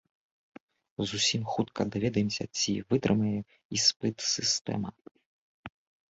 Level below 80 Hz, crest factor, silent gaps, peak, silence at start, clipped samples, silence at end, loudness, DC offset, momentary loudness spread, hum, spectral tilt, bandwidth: -62 dBFS; 20 dB; 3.65-3.70 s, 3.96-4.00 s, 4.61-4.65 s, 5.11-5.15 s, 5.26-5.64 s; -10 dBFS; 1 s; under 0.1%; 0.45 s; -29 LUFS; under 0.1%; 17 LU; none; -3.5 dB/octave; 8 kHz